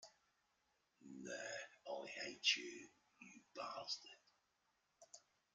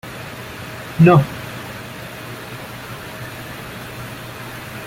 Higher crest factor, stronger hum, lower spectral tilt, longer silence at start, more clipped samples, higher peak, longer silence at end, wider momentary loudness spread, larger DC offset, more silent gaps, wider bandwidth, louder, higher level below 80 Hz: first, 30 dB vs 20 dB; neither; second, -0.5 dB/octave vs -7 dB/octave; about the same, 0 s vs 0.05 s; neither; second, -22 dBFS vs -2 dBFS; first, 0.35 s vs 0 s; first, 25 LU vs 19 LU; neither; neither; second, 9.6 kHz vs 16.5 kHz; second, -45 LUFS vs -22 LUFS; second, under -90 dBFS vs -48 dBFS